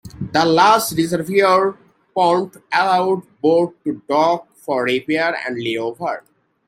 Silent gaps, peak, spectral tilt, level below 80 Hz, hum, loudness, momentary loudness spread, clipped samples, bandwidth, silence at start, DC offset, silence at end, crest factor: none; 0 dBFS; -4.5 dB/octave; -58 dBFS; none; -18 LUFS; 10 LU; under 0.1%; 16 kHz; 0.05 s; under 0.1%; 0.5 s; 18 dB